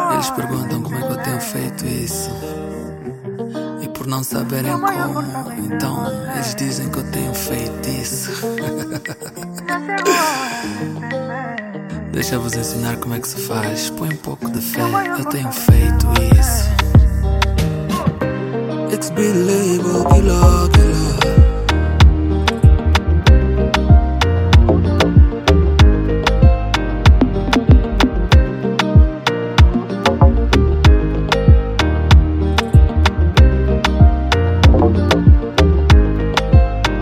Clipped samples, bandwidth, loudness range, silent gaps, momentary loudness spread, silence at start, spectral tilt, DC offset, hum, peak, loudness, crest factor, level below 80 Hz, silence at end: under 0.1%; 17 kHz; 9 LU; none; 12 LU; 0 s; -6 dB/octave; under 0.1%; none; 0 dBFS; -15 LUFS; 14 dB; -18 dBFS; 0 s